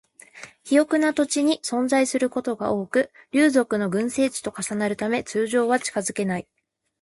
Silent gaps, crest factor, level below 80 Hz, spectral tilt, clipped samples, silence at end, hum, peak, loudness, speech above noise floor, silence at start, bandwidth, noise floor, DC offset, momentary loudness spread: none; 18 dB; -64 dBFS; -4 dB/octave; under 0.1%; 0.6 s; none; -6 dBFS; -23 LUFS; 23 dB; 0.35 s; 11.5 kHz; -45 dBFS; under 0.1%; 8 LU